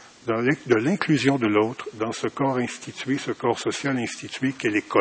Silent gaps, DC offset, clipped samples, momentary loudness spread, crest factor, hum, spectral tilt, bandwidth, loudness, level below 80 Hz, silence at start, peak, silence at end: none; under 0.1%; under 0.1%; 8 LU; 20 dB; none; -5.5 dB/octave; 8 kHz; -24 LUFS; -62 dBFS; 0 s; -4 dBFS; 0 s